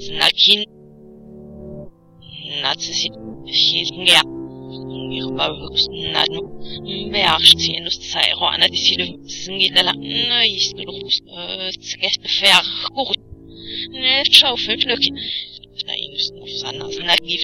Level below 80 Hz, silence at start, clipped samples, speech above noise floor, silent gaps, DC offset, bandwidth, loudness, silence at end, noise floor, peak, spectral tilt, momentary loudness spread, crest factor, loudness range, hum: -48 dBFS; 0 s; under 0.1%; 24 dB; none; under 0.1%; 16.5 kHz; -16 LUFS; 0 s; -42 dBFS; 0 dBFS; -1.5 dB/octave; 19 LU; 20 dB; 4 LU; none